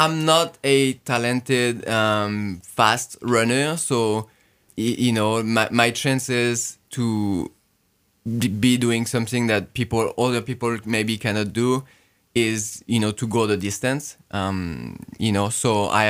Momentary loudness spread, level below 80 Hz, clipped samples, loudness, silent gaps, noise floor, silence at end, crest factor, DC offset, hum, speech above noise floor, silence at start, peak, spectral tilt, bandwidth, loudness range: 9 LU; -58 dBFS; under 0.1%; -22 LUFS; none; -65 dBFS; 0 s; 22 dB; under 0.1%; none; 44 dB; 0 s; 0 dBFS; -4.5 dB/octave; 16 kHz; 3 LU